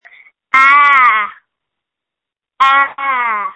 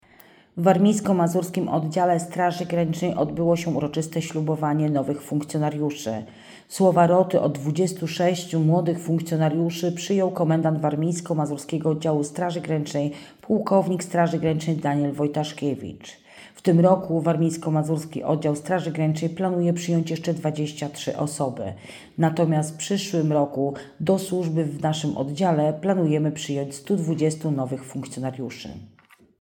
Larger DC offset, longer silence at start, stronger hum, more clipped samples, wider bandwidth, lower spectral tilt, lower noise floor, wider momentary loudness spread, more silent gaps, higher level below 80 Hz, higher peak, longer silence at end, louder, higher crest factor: neither; about the same, 0.55 s vs 0.55 s; neither; neither; second, 8.4 kHz vs 17.5 kHz; second, -0.5 dB/octave vs -6.5 dB/octave; first, -84 dBFS vs -53 dBFS; about the same, 9 LU vs 9 LU; neither; about the same, -62 dBFS vs -64 dBFS; first, 0 dBFS vs -4 dBFS; second, 0 s vs 0.55 s; first, -10 LUFS vs -24 LUFS; about the same, 14 dB vs 18 dB